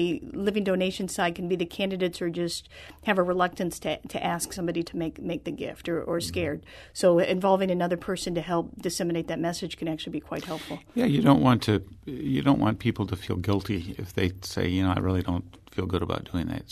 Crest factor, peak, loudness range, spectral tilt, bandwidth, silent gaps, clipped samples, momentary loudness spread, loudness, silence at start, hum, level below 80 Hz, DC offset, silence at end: 20 dB; -6 dBFS; 4 LU; -6 dB/octave; 13.5 kHz; none; under 0.1%; 11 LU; -27 LUFS; 0 s; none; -50 dBFS; under 0.1%; 0 s